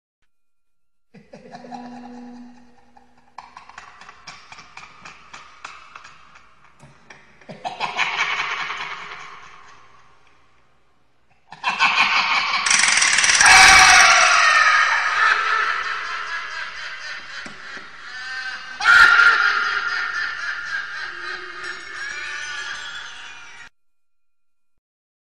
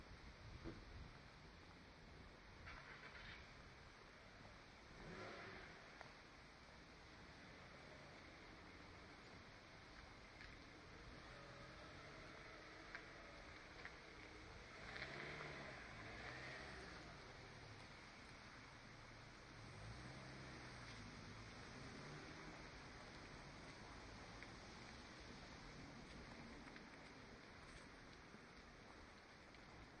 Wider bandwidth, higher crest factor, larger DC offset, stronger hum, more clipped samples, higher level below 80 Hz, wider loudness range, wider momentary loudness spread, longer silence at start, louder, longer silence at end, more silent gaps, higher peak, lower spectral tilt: first, 15 kHz vs 10 kHz; about the same, 22 dB vs 24 dB; first, 0.4% vs under 0.1%; neither; neither; first, -50 dBFS vs -68 dBFS; first, 20 LU vs 6 LU; first, 25 LU vs 8 LU; first, 1.15 s vs 0 s; first, -15 LUFS vs -58 LUFS; first, 1.7 s vs 0 s; neither; first, 0 dBFS vs -36 dBFS; second, 1 dB/octave vs -4.5 dB/octave